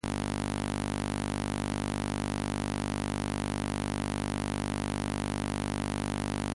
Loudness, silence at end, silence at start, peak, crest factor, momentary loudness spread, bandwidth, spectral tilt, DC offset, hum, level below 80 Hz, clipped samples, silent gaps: -33 LUFS; 0 s; 0.05 s; -16 dBFS; 16 dB; 0 LU; 11.5 kHz; -5 dB/octave; under 0.1%; none; -44 dBFS; under 0.1%; none